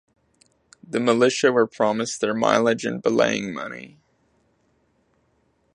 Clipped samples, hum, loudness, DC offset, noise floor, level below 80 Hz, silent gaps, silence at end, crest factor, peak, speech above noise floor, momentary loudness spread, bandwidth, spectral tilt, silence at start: under 0.1%; none; -21 LUFS; under 0.1%; -66 dBFS; -68 dBFS; none; 1.85 s; 22 dB; 0 dBFS; 45 dB; 12 LU; 11 kHz; -4 dB/octave; 0.9 s